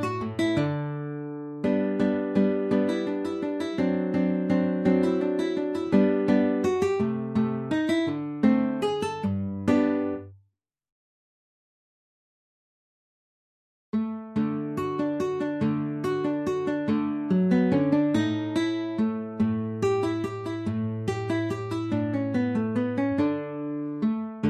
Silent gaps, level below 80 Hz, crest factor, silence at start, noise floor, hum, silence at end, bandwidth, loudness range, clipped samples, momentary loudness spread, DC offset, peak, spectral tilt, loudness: 10.92-13.93 s; -56 dBFS; 18 dB; 0 s; -71 dBFS; none; 0 s; 12 kHz; 7 LU; under 0.1%; 7 LU; under 0.1%; -10 dBFS; -7.5 dB/octave; -26 LUFS